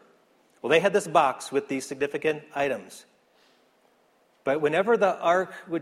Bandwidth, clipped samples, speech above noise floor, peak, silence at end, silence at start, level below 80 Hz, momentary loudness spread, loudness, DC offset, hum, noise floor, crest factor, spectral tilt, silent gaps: 14.5 kHz; under 0.1%; 39 dB; -6 dBFS; 0 s; 0.65 s; -70 dBFS; 11 LU; -25 LUFS; under 0.1%; none; -64 dBFS; 22 dB; -4.5 dB/octave; none